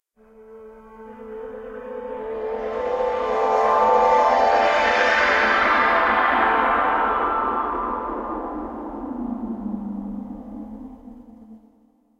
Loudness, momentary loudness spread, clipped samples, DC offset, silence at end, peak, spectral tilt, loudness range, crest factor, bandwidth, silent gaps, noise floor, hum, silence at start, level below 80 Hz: -20 LUFS; 19 LU; under 0.1%; under 0.1%; 0.65 s; -6 dBFS; -4.5 dB/octave; 14 LU; 18 dB; 8.8 kHz; none; -59 dBFS; none; 0.4 s; -48 dBFS